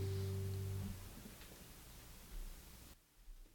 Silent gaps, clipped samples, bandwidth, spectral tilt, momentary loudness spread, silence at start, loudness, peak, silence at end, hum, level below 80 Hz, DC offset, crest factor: none; under 0.1%; 17 kHz; -6 dB/octave; 18 LU; 0 s; -49 LUFS; -32 dBFS; 0 s; none; -56 dBFS; under 0.1%; 14 dB